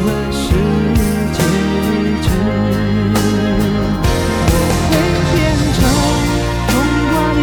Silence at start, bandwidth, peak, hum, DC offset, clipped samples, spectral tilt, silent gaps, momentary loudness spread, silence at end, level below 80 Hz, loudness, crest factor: 0 s; 18 kHz; 0 dBFS; none; under 0.1%; under 0.1%; -5.5 dB/octave; none; 2 LU; 0 s; -22 dBFS; -14 LUFS; 14 dB